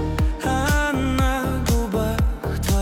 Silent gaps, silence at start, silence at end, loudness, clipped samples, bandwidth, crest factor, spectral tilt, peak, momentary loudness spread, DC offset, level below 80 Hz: none; 0 s; 0 s; -22 LUFS; under 0.1%; 17.5 kHz; 12 dB; -5.5 dB/octave; -10 dBFS; 3 LU; under 0.1%; -24 dBFS